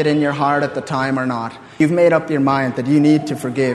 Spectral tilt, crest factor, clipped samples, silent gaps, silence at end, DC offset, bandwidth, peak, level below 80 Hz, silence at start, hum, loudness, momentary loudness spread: -7 dB/octave; 16 dB; under 0.1%; none; 0 s; under 0.1%; 12.5 kHz; 0 dBFS; -56 dBFS; 0 s; none; -17 LUFS; 8 LU